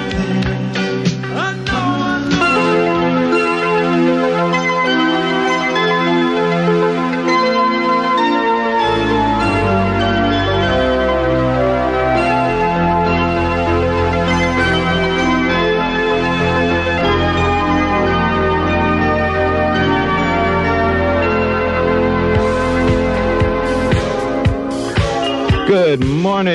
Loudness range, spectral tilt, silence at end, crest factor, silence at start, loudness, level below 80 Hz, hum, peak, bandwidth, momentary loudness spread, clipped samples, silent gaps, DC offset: 1 LU; -6 dB/octave; 0 s; 12 dB; 0 s; -15 LUFS; -30 dBFS; none; -2 dBFS; 11 kHz; 3 LU; under 0.1%; none; under 0.1%